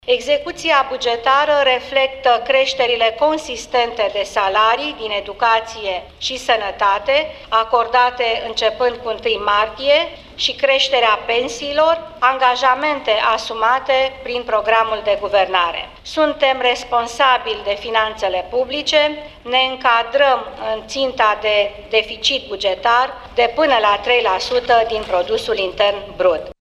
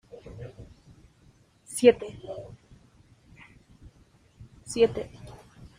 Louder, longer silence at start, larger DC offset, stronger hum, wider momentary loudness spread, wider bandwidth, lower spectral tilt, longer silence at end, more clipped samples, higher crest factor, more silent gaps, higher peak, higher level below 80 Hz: first, -17 LUFS vs -25 LUFS; second, 0.05 s vs 0.25 s; neither; neither; second, 6 LU vs 27 LU; second, 12 kHz vs 15 kHz; second, -2 dB/octave vs -4.5 dB/octave; second, 0.1 s vs 0.45 s; neither; second, 16 dB vs 26 dB; neither; about the same, -2 dBFS vs -4 dBFS; first, -46 dBFS vs -56 dBFS